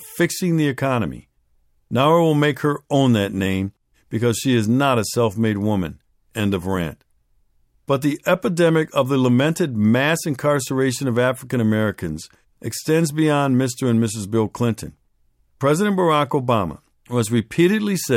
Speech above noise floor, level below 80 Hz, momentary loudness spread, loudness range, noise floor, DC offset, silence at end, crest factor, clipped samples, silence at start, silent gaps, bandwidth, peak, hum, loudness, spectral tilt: 42 dB; -52 dBFS; 9 LU; 3 LU; -61 dBFS; under 0.1%; 0 s; 16 dB; under 0.1%; 0 s; none; 16.5 kHz; -4 dBFS; none; -20 LUFS; -6 dB/octave